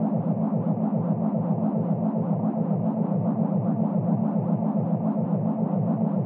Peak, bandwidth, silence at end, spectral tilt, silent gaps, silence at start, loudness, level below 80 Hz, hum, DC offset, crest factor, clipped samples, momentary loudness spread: -12 dBFS; 2.7 kHz; 0 s; -13.5 dB/octave; none; 0 s; -25 LUFS; -76 dBFS; none; under 0.1%; 12 dB; under 0.1%; 1 LU